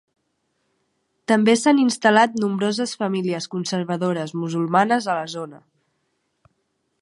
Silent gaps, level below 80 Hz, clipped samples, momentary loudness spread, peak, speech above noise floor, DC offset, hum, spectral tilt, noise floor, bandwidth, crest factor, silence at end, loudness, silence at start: none; -72 dBFS; under 0.1%; 10 LU; -2 dBFS; 52 dB; under 0.1%; none; -5 dB/octave; -72 dBFS; 11.5 kHz; 20 dB; 1.45 s; -20 LUFS; 1.3 s